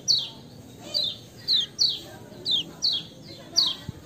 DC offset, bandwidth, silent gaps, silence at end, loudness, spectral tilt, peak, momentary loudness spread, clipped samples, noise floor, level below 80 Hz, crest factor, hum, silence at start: under 0.1%; 16 kHz; none; 0 s; -24 LUFS; -1 dB/octave; -8 dBFS; 20 LU; under 0.1%; -45 dBFS; -60 dBFS; 20 dB; none; 0 s